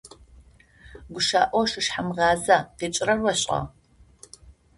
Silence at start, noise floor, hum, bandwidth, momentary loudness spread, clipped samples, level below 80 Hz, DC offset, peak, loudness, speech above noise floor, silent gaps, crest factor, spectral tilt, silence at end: 0.05 s; -53 dBFS; none; 11.5 kHz; 8 LU; under 0.1%; -52 dBFS; under 0.1%; -4 dBFS; -23 LUFS; 30 dB; none; 22 dB; -3 dB/octave; 0.25 s